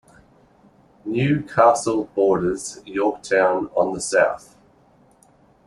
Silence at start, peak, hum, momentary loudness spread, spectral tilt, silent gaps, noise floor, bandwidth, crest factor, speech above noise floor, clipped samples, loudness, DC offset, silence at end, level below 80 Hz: 1.05 s; -2 dBFS; none; 12 LU; -5.5 dB/octave; none; -55 dBFS; 12 kHz; 20 dB; 36 dB; under 0.1%; -20 LUFS; under 0.1%; 1.3 s; -56 dBFS